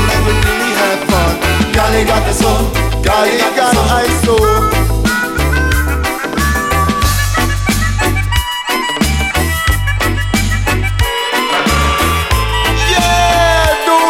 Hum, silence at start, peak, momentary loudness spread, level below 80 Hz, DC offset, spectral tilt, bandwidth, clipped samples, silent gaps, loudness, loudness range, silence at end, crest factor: none; 0 s; 0 dBFS; 4 LU; -18 dBFS; under 0.1%; -4 dB/octave; 17 kHz; under 0.1%; none; -12 LUFS; 2 LU; 0 s; 12 dB